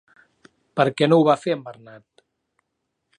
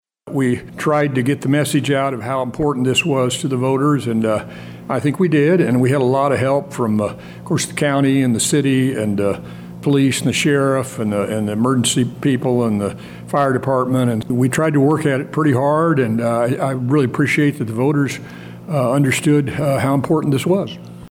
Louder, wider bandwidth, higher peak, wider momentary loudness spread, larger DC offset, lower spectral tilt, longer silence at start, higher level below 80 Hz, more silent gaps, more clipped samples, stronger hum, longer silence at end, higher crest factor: second, -20 LUFS vs -17 LUFS; second, 10.5 kHz vs 16.5 kHz; about the same, -2 dBFS vs -4 dBFS; first, 14 LU vs 7 LU; neither; first, -7 dB/octave vs -5.5 dB/octave; first, 0.75 s vs 0.25 s; second, -74 dBFS vs -52 dBFS; neither; neither; neither; first, 1.45 s vs 0 s; first, 22 dB vs 12 dB